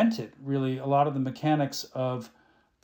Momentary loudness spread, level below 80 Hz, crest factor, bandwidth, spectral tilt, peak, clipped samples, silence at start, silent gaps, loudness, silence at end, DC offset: 10 LU; -74 dBFS; 16 dB; 18 kHz; -6.5 dB/octave; -12 dBFS; under 0.1%; 0 s; none; -28 LUFS; 0.55 s; under 0.1%